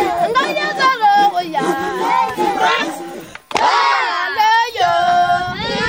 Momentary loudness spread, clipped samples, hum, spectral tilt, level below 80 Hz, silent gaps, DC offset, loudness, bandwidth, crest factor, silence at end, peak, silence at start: 7 LU; under 0.1%; none; -3 dB/octave; -50 dBFS; none; 0.1%; -15 LUFS; 16 kHz; 16 dB; 0 s; 0 dBFS; 0 s